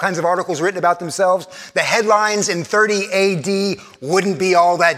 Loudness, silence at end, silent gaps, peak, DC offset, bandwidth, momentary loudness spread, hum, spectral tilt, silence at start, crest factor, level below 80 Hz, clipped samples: -17 LUFS; 0 s; none; 0 dBFS; under 0.1%; 15.5 kHz; 6 LU; none; -3.5 dB/octave; 0 s; 16 dB; -68 dBFS; under 0.1%